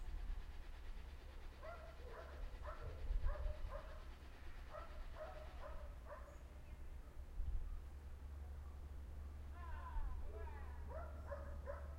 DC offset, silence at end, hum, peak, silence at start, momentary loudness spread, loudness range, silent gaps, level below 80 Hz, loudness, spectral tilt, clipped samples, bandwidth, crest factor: under 0.1%; 0 s; none; -30 dBFS; 0 s; 8 LU; 3 LU; none; -50 dBFS; -54 LUFS; -6.5 dB/octave; under 0.1%; 15.5 kHz; 18 dB